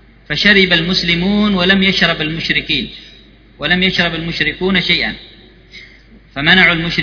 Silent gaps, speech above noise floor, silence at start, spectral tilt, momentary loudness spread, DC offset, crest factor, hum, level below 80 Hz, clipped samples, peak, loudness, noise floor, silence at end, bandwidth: none; 29 dB; 0.3 s; -5 dB/octave; 11 LU; under 0.1%; 16 dB; none; -38 dBFS; under 0.1%; 0 dBFS; -12 LUFS; -42 dBFS; 0 s; 5.4 kHz